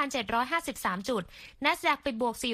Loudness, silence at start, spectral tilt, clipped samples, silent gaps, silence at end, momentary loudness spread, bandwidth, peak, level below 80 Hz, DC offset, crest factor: -30 LUFS; 0 s; -3 dB/octave; under 0.1%; none; 0 s; 6 LU; 15 kHz; -10 dBFS; -58 dBFS; under 0.1%; 20 dB